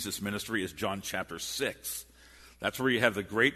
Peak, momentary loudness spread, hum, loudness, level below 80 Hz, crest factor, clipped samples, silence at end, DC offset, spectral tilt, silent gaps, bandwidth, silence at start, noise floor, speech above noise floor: -8 dBFS; 9 LU; none; -32 LUFS; -60 dBFS; 24 dB; under 0.1%; 0 s; under 0.1%; -3.5 dB/octave; none; 13.5 kHz; 0 s; -56 dBFS; 24 dB